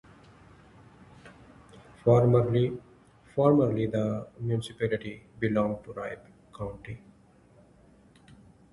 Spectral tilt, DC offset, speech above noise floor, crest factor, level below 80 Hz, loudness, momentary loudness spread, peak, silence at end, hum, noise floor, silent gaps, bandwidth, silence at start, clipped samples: -8.5 dB/octave; under 0.1%; 32 dB; 22 dB; -56 dBFS; -28 LUFS; 20 LU; -8 dBFS; 1.75 s; none; -58 dBFS; none; 11.5 kHz; 1.25 s; under 0.1%